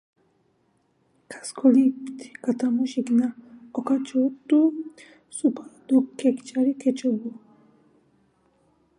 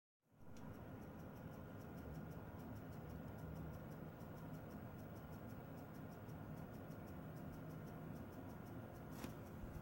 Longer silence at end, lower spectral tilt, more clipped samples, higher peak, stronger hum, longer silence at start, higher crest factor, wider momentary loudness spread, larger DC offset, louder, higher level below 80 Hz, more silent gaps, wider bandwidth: first, 1.7 s vs 0 s; second, -5.5 dB/octave vs -7.5 dB/octave; neither; first, -6 dBFS vs -36 dBFS; neither; first, 1.3 s vs 0.3 s; about the same, 18 dB vs 18 dB; first, 17 LU vs 3 LU; neither; first, -24 LUFS vs -54 LUFS; second, -78 dBFS vs -66 dBFS; neither; second, 11 kHz vs 17 kHz